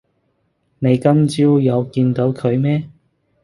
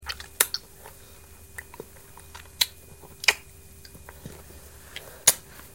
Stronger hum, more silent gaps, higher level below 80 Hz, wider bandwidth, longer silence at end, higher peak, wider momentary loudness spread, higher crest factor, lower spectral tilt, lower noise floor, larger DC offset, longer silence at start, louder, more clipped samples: neither; neither; about the same, -54 dBFS vs -54 dBFS; second, 11.5 kHz vs 18 kHz; first, 0.55 s vs 0.05 s; about the same, 0 dBFS vs 0 dBFS; second, 7 LU vs 26 LU; second, 16 dB vs 32 dB; first, -8.5 dB/octave vs 0.5 dB/octave; first, -65 dBFS vs -49 dBFS; second, under 0.1% vs 0.2%; first, 0.8 s vs 0 s; first, -16 LUFS vs -24 LUFS; neither